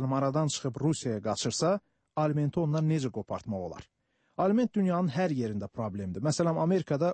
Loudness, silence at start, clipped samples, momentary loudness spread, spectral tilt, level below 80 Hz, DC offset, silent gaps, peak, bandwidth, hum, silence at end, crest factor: -30 LUFS; 0 s; under 0.1%; 9 LU; -6 dB/octave; -64 dBFS; under 0.1%; none; -16 dBFS; 8.8 kHz; none; 0 s; 14 dB